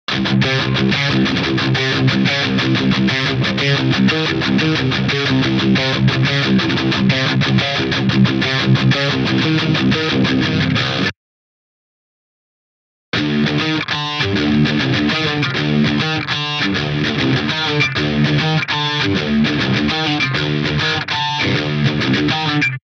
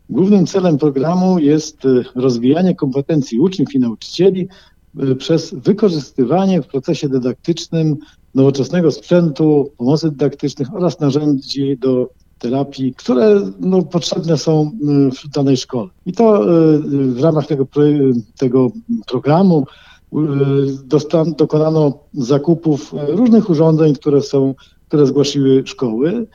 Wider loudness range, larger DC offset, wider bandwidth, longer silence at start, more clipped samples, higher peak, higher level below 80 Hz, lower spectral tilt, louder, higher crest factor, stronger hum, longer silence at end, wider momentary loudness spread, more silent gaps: about the same, 4 LU vs 3 LU; neither; about the same, 7.6 kHz vs 7.6 kHz; about the same, 0.1 s vs 0.1 s; neither; about the same, -2 dBFS vs 0 dBFS; first, -42 dBFS vs -52 dBFS; second, -5.5 dB/octave vs -7.5 dB/octave; about the same, -16 LUFS vs -15 LUFS; about the same, 14 dB vs 14 dB; neither; about the same, 0.15 s vs 0.1 s; second, 3 LU vs 8 LU; first, 11.17-13.12 s vs none